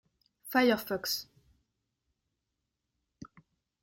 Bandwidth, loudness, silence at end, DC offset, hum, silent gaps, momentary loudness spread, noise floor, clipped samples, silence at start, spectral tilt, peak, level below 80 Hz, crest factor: 16.5 kHz; -30 LUFS; 0.55 s; under 0.1%; none; none; 9 LU; -85 dBFS; under 0.1%; 0.45 s; -3 dB/octave; -14 dBFS; -72 dBFS; 22 dB